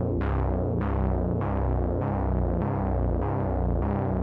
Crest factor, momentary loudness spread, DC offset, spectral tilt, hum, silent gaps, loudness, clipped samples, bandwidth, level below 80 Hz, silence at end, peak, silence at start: 12 dB; 1 LU; under 0.1%; -12 dB/octave; none; none; -27 LUFS; under 0.1%; 3.7 kHz; -30 dBFS; 0 s; -14 dBFS; 0 s